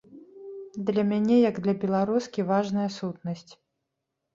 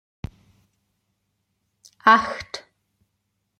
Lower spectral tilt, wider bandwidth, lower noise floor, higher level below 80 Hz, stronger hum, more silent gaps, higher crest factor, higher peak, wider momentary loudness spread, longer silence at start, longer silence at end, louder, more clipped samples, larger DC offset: first, -7.5 dB/octave vs -4 dB/octave; second, 7.6 kHz vs 10 kHz; first, -82 dBFS vs -75 dBFS; second, -68 dBFS vs -54 dBFS; neither; neither; second, 16 dB vs 26 dB; second, -10 dBFS vs 0 dBFS; second, 18 LU vs 23 LU; second, 0.1 s vs 2.05 s; second, 0.8 s vs 1 s; second, -26 LUFS vs -18 LUFS; neither; neither